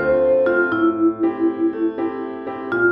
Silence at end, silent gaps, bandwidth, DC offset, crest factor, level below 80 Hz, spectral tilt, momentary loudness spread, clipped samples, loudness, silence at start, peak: 0 s; none; 3.9 kHz; under 0.1%; 12 dB; -52 dBFS; -9.5 dB/octave; 10 LU; under 0.1%; -19 LUFS; 0 s; -6 dBFS